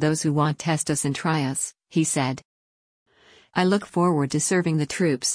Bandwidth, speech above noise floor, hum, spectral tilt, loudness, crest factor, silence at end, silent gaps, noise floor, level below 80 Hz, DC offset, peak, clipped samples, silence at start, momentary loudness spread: 10.5 kHz; over 67 dB; none; -4.5 dB/octave; -23 LUFS; 14 dB; 0 s; 2.45-3.06 s; under -90 dBFS; -62 dBFS; under 0.1%; -10 dBFS; under 0.1%; 0 s; 5 LU